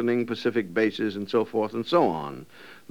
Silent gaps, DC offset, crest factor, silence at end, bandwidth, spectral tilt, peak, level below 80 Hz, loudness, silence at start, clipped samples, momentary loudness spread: none; 0.2%; 18 dB; 0.15 s; 16 kHz; -6.5 dB/octave; -10 dBFS; -70 dBFS; -26 LUFS; 0 s; under 0.1%; 13 LU